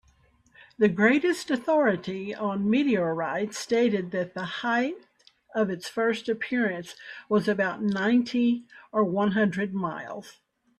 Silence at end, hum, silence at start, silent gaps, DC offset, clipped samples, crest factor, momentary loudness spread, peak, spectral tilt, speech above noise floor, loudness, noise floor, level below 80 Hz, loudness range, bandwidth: 0.5 s; none; 0.8 s; none; under 0.1%; under 0.1%; 18 dB; 9 LU; -8 dBFS; -6 dB/octave; 37 dB; -26 LUFS; -62 dBFS; -68 dBFS; 3 LU; 13 kHz